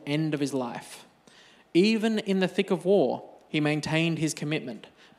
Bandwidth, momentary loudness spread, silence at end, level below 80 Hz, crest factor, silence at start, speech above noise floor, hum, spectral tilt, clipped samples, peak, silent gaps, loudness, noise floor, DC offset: 14 kHz; 16 LU; 0.3 s; -72 dBFS; 18 dB; 0 s; 30 dB; none; -5.5 dB/octave; under 0.1%; -10 dBFS; none; -27 LUFS; -56 dBFS; under 0.1%